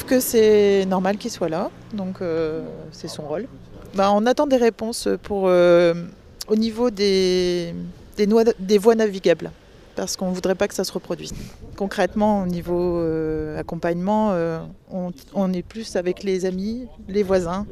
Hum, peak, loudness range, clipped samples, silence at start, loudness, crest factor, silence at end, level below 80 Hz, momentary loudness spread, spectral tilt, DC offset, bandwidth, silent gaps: none; -2 dBFS; 5 LU; under 0.1%; 0 s; -21 LUFS; 20 dB; 0 s; -46 dBFS; 15 LU; -5.5 dB/octave; under 0.1%; 15.5 kHz; none